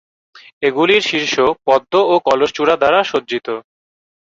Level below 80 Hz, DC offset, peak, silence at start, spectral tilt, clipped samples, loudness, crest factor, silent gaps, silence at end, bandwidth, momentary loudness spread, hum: -56 dBFS; under 0.1%; 0 dBFS; 0.6 s; -3.5 dB/octave; under 0.1%; -15 LUFS; 16 dB; none; 0.65 s; 7.6 kHz; 9 LU; none